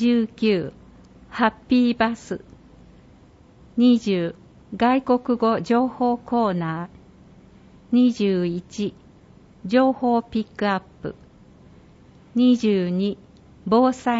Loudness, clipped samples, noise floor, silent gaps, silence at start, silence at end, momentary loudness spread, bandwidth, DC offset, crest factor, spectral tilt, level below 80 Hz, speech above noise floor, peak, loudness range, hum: -21 LUFS; under 0.1%; -50 dBFS; none; 0 s; 0 s; 16 LU; 7.8 kHz; under 0.1%; 18 dB; -7 dB/octave; -56 dBFS; 30 dB; -6 dBFS; 3 LU; none